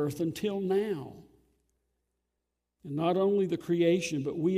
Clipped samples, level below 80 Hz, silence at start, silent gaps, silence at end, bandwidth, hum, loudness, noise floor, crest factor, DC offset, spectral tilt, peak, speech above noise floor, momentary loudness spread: under 0.1%; -70 dBFS; 0 s; none; 0 s; 15.5 kHz; 60 Hz at -60 dBFS; -30 LUFS; -84 dBFS; 16 dB; under 0.1%; -6.5 dB/octave; -16 dBFS; 55 dB; 10 LU